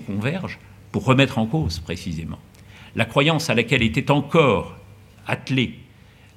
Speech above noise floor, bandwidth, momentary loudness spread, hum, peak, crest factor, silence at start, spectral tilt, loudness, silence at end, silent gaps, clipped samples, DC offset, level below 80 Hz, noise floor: 28 dB; 15 kHz; 16 LU; none; 0 dBFS; 22 dB; 0 s; -6 dB/octave; -21 LUFS; 0.55 s; none; under 0.1%; under 0.1%; -48 dBFS; -49 dBFS